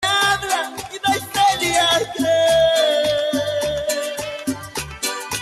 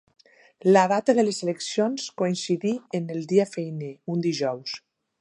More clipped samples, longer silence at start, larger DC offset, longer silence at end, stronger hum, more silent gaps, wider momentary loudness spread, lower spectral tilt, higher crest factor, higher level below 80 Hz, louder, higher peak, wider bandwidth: neither; second, 0 s vs 0.65 s; neither; second, 0 s vs 0.4 s; neither; neither; about the same, 11 LU vs 13 LU; second, -2 dB/octave vs -5.5 dB/octave; second, 14 dB vs 20 dB; first, -48 dBFS vs -78 dBFS; first, -19 LUFS vs -25 LUFS; about the same, -6 dBFS vs -4 dBFS; first, 13 kHz vs 11 kHz